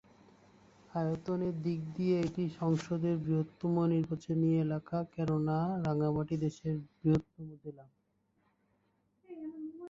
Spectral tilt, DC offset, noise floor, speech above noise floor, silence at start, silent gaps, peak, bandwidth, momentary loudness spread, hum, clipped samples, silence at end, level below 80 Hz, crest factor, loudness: -9 dB/octave; under 0.1%; -76 dBFS; 43 dB; 0.95 s; none; -18 dBFS; 7.6 kHz; 14 LU; none; under 0.1%; 0 s; -64 dBFS; 16 dB; -34 LUFS